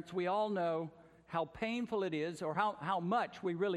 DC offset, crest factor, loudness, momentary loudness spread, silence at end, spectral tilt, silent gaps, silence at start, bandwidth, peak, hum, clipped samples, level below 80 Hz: under 0.1%; 18 dB; -37 LUFS; 6 LU; 0 s; -6.5 dB/octave; none; 0 s; 12 kHz; -20 dBFS; none; under 0.1%; -72 dBFS